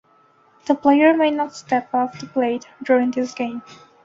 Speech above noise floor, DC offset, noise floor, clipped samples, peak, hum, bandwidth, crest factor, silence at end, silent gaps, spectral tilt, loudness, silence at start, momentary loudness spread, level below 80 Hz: 37 dB; under 0.1%; -56 dBFS; under 0.1%; -4 dBFS; none; 7.8 kHz; 18 dB; 0.3 s; none; -5 dB/octave; -20 LUFS; 0.65 s; 13 LU; -66 dBFS